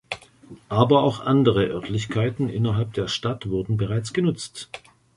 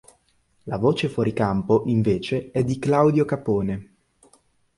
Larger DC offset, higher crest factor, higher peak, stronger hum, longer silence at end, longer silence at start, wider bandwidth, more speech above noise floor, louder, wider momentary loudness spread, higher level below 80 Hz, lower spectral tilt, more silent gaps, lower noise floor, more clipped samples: neither; about the same, 20 dB vs 18 dB; about the same, -4 dBFS vs -4 dBFS; neither; second, 0.4 s vs 0.95 s; second, 0.1 s vs 0.65 s; about the same, 11.5 kHz vs 11.5 kHz; second, 25 dB vs 43 dB; about the same, -23 LUFS vs -22 LUFS; first, 16 LU vs 9 LU; about the same, -50 dBFS vs -50 dBFS; about the same, -6.5 dB/octave vs -7.5 dB/octave; neither; second, -47 dBFS vs -64 dBFS; neither